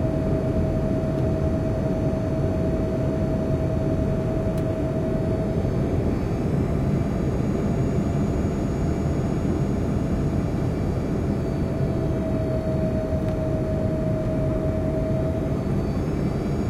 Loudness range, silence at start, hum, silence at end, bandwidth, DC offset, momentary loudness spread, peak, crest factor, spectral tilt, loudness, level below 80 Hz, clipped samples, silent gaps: 1 LU; 0 s; none; 0 s; 13 kHz; under 0.1%; 1 LU; -10 dBFS; 12 dB; -9 dB/octave; -24 LUFS; -32 dBFS; under 0.1%; none